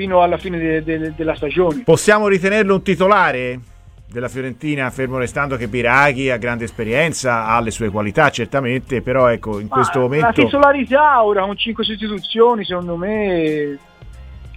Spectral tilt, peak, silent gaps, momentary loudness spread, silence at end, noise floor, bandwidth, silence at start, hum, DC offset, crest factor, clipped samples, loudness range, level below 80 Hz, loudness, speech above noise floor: -5 dB/octave; 0 dBFS; none; 10 LU; 0 s; -36 dBFS; 15.5 kHz; 0 s; none; under 0.1%; 16 dB; under 0.1%; 4 LU; -40 dBFS; -16 LUFS; 20 dB